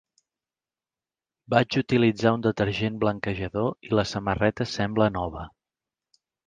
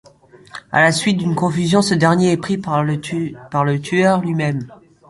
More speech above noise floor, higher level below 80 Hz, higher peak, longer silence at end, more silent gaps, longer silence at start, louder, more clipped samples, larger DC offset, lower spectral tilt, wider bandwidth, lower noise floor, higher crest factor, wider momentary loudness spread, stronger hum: first, over 66 dB vs 29 dB; about the same, -50 dBFS vs -54 dBFS; about the same, -4 dBFS vs -2 dBFS; first, 1 s vs 0.35 s; neither; first, 1.5 s vs 0.55 s; second, -25 LUFS vs -17 LUFS; neither; neither; about the same, -6.5 dB/octave vs -5.5 dB/octave; second, 9.4 kHz vs 11.5 kHz; first, under -90 dBFS vs -46 dBFS; first, 22 dB vs 16 dB; about the same, 8 LU vs 10 LU; neither